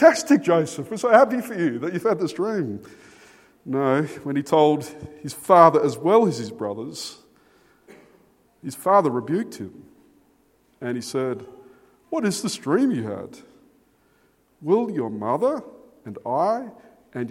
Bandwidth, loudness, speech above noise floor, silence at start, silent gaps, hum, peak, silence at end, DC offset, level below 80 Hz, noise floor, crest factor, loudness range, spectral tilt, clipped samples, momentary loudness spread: 16.5 kHz; -22 LUFS; 41 dB; 0 s; none; none; 0 dBFS; 0 s; under 0.1%; -68 dBFS; -62 dBFS; 22 dB; 8 LU; -5.5 dB/octave; under 0.1%; 19 LU